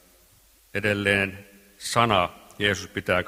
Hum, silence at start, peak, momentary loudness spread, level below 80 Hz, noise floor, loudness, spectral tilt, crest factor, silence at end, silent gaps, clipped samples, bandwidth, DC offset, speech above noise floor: none; 0.75 s; -2 dBFS; 12 LU; -56 dBFS; -58 dBFS; -24 LUFS; -4 dB/octave; 24 dB; 0 s; none; under 0.1%; 16 kHz; under 0.1%; 34 dB